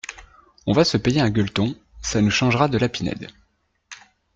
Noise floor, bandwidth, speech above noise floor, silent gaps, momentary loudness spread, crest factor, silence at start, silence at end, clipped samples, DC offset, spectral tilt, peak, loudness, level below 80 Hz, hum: -66 dBFS; 9.2 kHz; 46 dB; none; 21 LU; 18 dB; 0.1 s; 0.4 s; under 0.1%; under 0.1%; -5 dB/octave; -4 dBFS; -21 LUFS; -46 dBFS; none